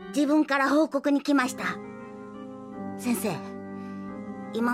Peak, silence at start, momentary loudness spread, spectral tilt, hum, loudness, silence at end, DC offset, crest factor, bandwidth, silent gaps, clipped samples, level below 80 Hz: -12 dBFS; 0 s; 18 LU; -5 dB/octave; none; -26 LUFS; 0 s; under 0.1%; 16 dB; 15.5 kHz; none; under 0.1%; -68 dBFS